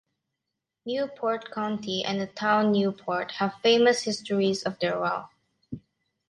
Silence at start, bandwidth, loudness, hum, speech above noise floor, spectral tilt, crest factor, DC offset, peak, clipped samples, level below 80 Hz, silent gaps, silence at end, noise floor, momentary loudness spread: 0.85 s; 11.5 kHz; -26 LUFS; none; 59 dB; -4.5 dB/octave; 20 dB; under 0.1%; -8 dBFS; under 0.1%; -68 dBFS; none; 0.5 s; -85 dBFS; 13 LU